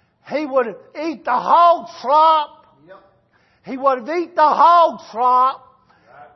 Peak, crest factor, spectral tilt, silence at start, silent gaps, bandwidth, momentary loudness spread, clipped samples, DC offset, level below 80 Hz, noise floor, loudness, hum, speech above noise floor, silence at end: -2 dBFS; 16 dB; -4.5 dB/octave; 0.3 s; none; 6.2 kHz; 15 LU; under 0.1%; under 0.1%; -70 dBFS; -59 dBFS; -16 LUFS; none; 43 dB; 0.1 s